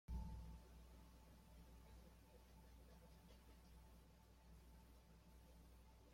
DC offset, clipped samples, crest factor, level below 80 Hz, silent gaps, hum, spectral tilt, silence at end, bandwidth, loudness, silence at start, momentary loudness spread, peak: under 0.1%; under 0.1%; 20 dB; -62 dBFS; none; none; -6 dB/octave; 0 s; 16.5 kHz; -65 LUFS; 0.1 s; 10 LU; -40 dBFS